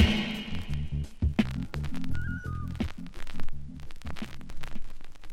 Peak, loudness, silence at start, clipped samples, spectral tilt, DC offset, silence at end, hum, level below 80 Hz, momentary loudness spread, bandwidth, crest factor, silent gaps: -8 dBFS; -34 LUFS; 0 s; under 0.1%; -6 dB/octave; under 0.1%; 0 s; none; -36 dBFS; 15 LU; 9.8 kHz; 20 dB; none